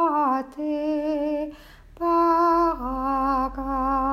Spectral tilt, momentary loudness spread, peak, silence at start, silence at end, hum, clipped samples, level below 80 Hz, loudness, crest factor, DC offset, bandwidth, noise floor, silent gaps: -7 dB/octave; 9 LU; -10 dBFS; 0 s; 0 s; none; under 0.1%; -42 dBFS; -24 LUFS; 14 dB; under 0.1%; 15.5 kHz; -46 dBFS; none